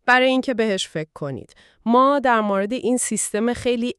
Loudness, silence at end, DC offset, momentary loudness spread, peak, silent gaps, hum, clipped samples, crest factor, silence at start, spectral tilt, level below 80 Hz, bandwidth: -20 LUFS; 0.05 s; under 0.1%; 14 LU; -4 dBFS; none; none; under 0.1%; 16 dB; 0.05 s; -3.5 dB/octave; -54 dBFS; 13.5 kHz